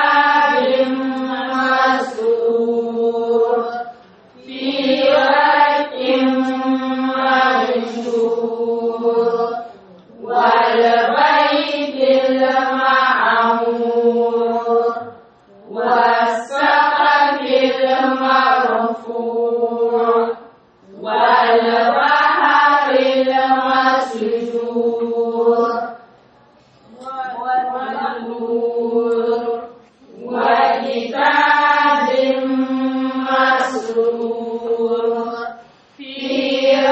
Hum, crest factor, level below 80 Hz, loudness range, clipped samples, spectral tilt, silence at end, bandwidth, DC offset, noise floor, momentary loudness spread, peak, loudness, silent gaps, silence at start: none; 14 dB; -68 dBFS; 6 LU; under 0.1%; -4 dB/octave; 0 s; 8.2 kHz; under 0.1%; -50 dBFS; 10 LU; -2 dBFS; -16 LUFS; none; 0 s